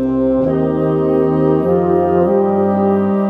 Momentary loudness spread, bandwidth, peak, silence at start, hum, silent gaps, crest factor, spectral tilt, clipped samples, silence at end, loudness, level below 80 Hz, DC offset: 2 LU; 4 kHz; -2 dBFS; 0 s; none; none; 12 dB; -11 dB/octave; under 0.1%; 0 s; -14 LUFS; -40 dBFS; under 0.1%